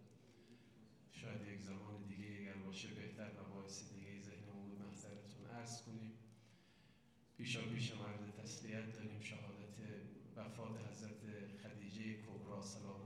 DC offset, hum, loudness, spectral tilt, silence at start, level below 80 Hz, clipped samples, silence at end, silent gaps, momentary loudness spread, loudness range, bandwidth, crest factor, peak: under 0.1%; none; -52 LUFS; -5 dB/octave; 0 s; -84 dBFS; under 0.1%; 0 s; none; 19 LU; 5 LU; 13.5 kHz; 20 dB; -32 dBFS